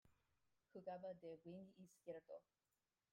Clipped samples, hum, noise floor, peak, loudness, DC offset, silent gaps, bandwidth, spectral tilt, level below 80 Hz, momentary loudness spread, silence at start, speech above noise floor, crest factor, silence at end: under 0.1%; none; -87 dBFS; -42 dBFS; -58 LUFS; under 0.1%; none; 14.5 kHz; -7 dB/octave; under -90 dBFS; 9 LU; 0.05 s; 30 dB; 18 dB; 0.7 s